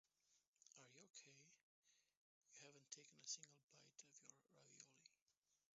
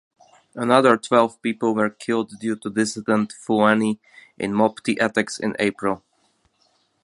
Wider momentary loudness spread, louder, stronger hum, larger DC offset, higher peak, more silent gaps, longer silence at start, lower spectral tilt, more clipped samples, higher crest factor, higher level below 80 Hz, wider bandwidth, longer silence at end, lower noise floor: first, 15 LU vs 11 LU; second, -61 LUFS vs -21 LUFS; neither; neither; second, -38 dBFS vs 0 dBFS; first, 0.47-0.53 s, 1.10-1.14 s, 1.63-1.82 s, 2.17-2.41 s, 3.63-3.68 s, 5.22-5.26 s, 5.37-5.42 s vs none; second, 0.25 s vs 0.55 s; second, -1.5 dB/octave vs -5 dB/octave; neither; first, 28 dB vs 22 dB; second, under -90 dBFS vs -64 dBFS; second, 7.6 kHz vs 11.5 kHz; second, 0.2 s vs 1.05 s; first, -90 dBFS vs -65 dBFS